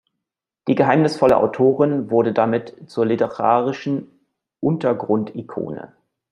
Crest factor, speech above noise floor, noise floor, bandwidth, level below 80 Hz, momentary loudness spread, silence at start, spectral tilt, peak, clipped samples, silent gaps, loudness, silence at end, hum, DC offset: 18 dB; 65 dB; -84 dBFS; 11 kHz; -60 dBFS; 13 LU; 0.65 s; -8 dB/octave; -2 dBFS; under 0.1%; none; -19 LUFS; 0.45 s; none; under 0.1%